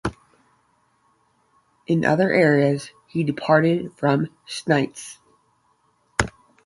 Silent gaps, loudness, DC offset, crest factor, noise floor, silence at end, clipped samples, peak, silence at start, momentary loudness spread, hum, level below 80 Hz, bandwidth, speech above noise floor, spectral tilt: none; -21 LUFS; under 0.1%; 22 dB; -64 dBFS; 0.35 s; under 0.1%; 0 dBFS; 0.05 s; 14 LU; none; -48 dBFS; 11.5 kHz; 44 dB; -6 dB/octave